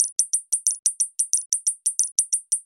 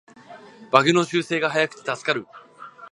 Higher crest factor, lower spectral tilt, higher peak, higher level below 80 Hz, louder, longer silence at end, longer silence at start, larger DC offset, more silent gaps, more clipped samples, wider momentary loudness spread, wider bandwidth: about the same, 24 dB vs 24 dB; second, 8 dB/octave vs -4.5 dB/octave; about the same, 0 dBFS vs 0 dBFS; second, -84 dBFS vs -72 dBFS; about the same, -21 LUFS vs -21 LUFS; about the same, 0.05 s vs 0.05 s; second, 0 s vs 0.3 s; neither; first, 0.12-0.16 s, 0.79-0.83 s, 1.46-1.50 s, 2.12-2.16 s vs none; neither; second, 2 LU vs 12 LU; first, 16 kHz vs 11.5 kHz